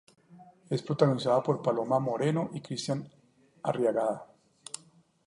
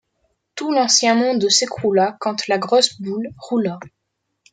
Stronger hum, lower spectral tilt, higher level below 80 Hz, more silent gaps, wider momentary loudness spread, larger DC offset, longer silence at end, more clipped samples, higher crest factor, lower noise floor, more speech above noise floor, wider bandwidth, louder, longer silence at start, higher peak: neither; first, -6.5 dB/octave vs -2.5 dB/octave; second, -74 dBFS vs -64 dBFS; neither; first, 16 LU vs 13 LU; neither; first, 1.05 s vs 0.65 s; neither; about the same, 22 dB vs 18 dB; second, -60 dBFS vs -75 dBFS; second, 32 dB vs 57 dB; first, 11.5 kHz vs 9.6 kHz; second, -30 LUFS vs -18 LUFS; second, 0.3 s vs 0.55 s; second, -8 dBFS vs 0 dBFS